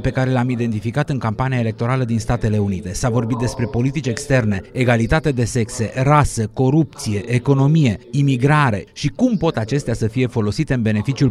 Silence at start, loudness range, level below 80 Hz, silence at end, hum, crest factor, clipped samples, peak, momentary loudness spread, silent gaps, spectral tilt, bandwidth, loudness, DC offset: 0 s; 3 LU; -36 dBFS; 0 s; none; 16 dB; under 0.1%; -2 dBFS; 6 LU; none; -6.5 dB/octave; 12.5 kHz; -18 LUFS; under 0.1%